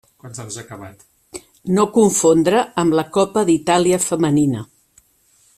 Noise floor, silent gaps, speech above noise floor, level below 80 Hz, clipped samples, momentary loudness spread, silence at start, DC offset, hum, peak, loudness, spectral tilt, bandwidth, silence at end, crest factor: -57 dBFS; none; 40 dB; -54 dBFS; under 0.1%; 22 LU; 0.25 s; under 0.1%; none; -2 dBFS; -16 LUFS; -5 dB/octave; 15 kHz; 0.95 s; 16 dB